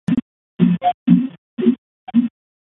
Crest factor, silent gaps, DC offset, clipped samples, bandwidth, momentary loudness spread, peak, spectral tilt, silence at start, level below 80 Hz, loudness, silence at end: 18 dB; 0.22-0.57 s, 0.94-1.06 s, 1.38-1.57 s, 1.78-2.07 s; under 0.1%; under 0.1%; 3.9 kHz; 11 LU; -2 dBFS; -10 dB/octave; 0.1 s; -56 dBFS; -19 LUFS; 0.35 s